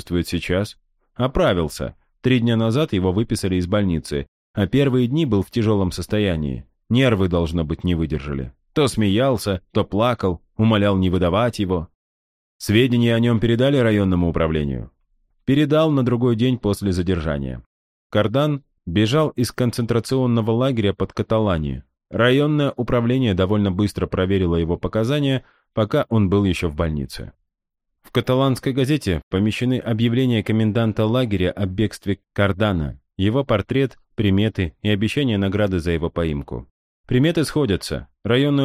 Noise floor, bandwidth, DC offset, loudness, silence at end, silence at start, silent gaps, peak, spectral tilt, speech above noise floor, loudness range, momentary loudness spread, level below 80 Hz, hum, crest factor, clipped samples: -78 dBFS; 15 kHz; under 0.1%; -20 LUFS; 0 s; 0.05 s; 4.28-4.54 s, 11.95-12.60 s, 17.66-18.10 s, 29.23-29.31 s, 36.70-37.04 s; -4 dBFS; -7 dB/octave; 59 dB; 2 LU; 9 LU; -38 dBFS; none; 16 dB; under 0.1%